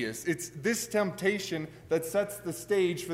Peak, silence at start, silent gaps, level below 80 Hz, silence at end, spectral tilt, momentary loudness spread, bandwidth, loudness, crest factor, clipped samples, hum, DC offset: -14 dBFS; 0 s; none; -66 dBFS; 0 s; -4 dB/octave; 7 LU; 16 kHz; -31 LUFS; 16 dB; under 0.1%; none; under 0.1%